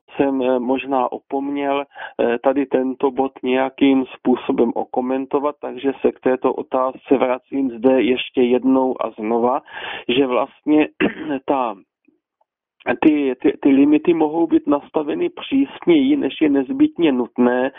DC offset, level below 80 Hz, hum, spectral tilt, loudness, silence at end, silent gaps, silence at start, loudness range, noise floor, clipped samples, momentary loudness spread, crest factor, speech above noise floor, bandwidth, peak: under 0.1%; -58 dBFS; none; -4 dB/octave; -19 LUFS; 0 s; none; 0.1 s; 3 LU; -70 dBFS; under 0.1%; 8 LU; 16 dB; 52 dB; 3.8 kHz; -2 dBFS